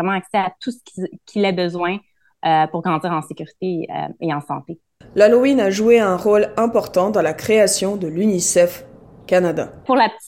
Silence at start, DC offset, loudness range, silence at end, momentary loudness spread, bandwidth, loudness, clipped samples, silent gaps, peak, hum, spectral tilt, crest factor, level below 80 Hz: 0 s; under 0.1%; 6 LU; 0 s; 15 LU; 16.5 kHz; -18 LUFS; under 0.1%; none; -2 dBFS; none; -4.5 dB/octave; 16 dB; -56 dBFS